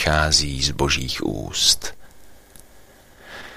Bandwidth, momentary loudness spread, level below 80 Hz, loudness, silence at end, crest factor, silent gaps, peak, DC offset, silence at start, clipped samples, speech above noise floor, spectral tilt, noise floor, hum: 15.5 kHz; 18 LU; -34 dBFS; -19 LUFS; 0 s; 22 dB; none; -2 dBFS; under 0.1%; 0 s; under 0.1%; 27 dB; -2.5 dB/octave; -48 dBFS; none